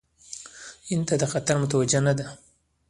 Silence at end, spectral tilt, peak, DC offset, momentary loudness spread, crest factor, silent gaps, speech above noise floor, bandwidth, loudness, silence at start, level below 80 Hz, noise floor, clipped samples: 0.55 s; -5 dB/octave; -8 dBFS; under 0.1%; 19 LU; 18 dB; none; 21 dB; 11.5 kHz; -24 LUFS; 0.3 s; -58 dBFS; -45 dBFS; under 0.1%